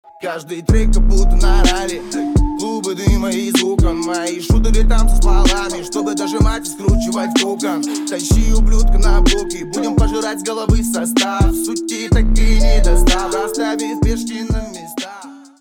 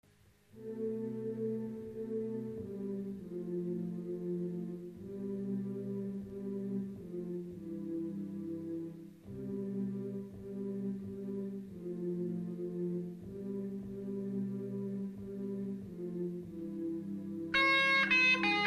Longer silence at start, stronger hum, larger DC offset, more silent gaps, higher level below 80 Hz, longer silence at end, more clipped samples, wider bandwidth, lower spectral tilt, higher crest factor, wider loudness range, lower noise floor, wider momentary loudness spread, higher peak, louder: second, 0.2 s vs 0.55 s; second, none vs 50 Hz at -75 dBFS; neither; neither; first, -16 dBFS vs -70 dBFS; first, 0.2 s vs 0 s; neither; first, 15.5 kHz vs 13 kHz; about the same, -5 dB/octave vs -6 dB/octave; second, 12 dB vs 18 dB; second, 1 LU vs 6 LU; second, -35 dBFS vs -66 dBFS; second, 7 LU vs 14 LU; first, 0 dBFS vs -20 dBFS; first, -17 LUFS vs -37 LUFS